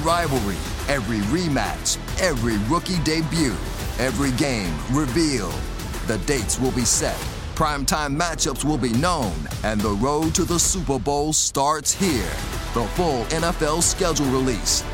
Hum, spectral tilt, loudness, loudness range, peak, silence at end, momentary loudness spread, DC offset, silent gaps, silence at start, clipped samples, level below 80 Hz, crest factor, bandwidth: none; -4 dB/octave; -22 LUFS; 2 LU; -4 dBFS; 0 s; 7 LU; under 0.1%; none; 0 s; under 0.1%; -32 dBFS; 18 dB; 16.5 kHz